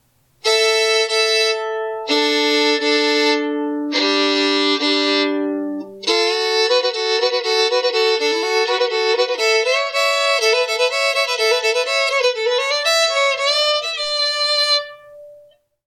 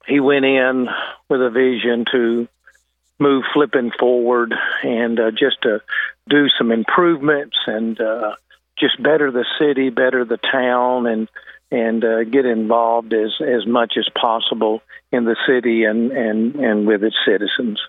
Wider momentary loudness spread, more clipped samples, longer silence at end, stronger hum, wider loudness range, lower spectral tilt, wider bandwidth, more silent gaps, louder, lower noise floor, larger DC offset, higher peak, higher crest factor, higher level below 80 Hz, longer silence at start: about the same, 5 LU vs 6 LU; neither; first, 0.5 s vs 0 s; neither; about the same, 1 LU vs 1 LU; second, 0 dB/octave vs -7.5 dB/octave; first, 14.5 kHz vs 4.1 kHz; neither; about the same, -16 LUFS vs -17 LUFS; second, -50 dBFS vs -59 dBFS; neither; second, -6 dBFS vs 0 dBFS; about the same, 12 dB vs 16 dB; about the same, -74 dBFS vs -70 dBFS; first, 0.45 s vs 0.05 s